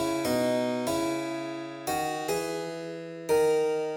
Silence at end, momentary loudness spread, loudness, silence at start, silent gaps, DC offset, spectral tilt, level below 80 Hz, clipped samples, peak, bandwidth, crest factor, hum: 0 s; 11 LU; -29 LUFS; 0 s; none; under 0.1%; -4.5 dB/octave; -64 dBFS; under 0.1%; -16 dBFS; 19.5 kHz; 14 dB; none